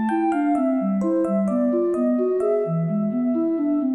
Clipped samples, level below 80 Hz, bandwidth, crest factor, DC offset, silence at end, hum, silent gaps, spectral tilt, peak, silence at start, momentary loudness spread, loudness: under 0.1%; -64 dBFS; 10.5 kHz; 8 dB; under 0.1%; 0 s; none; none; -10 dB/octave; -12 dBFS; 0 s; 2 LU; -22 LUFS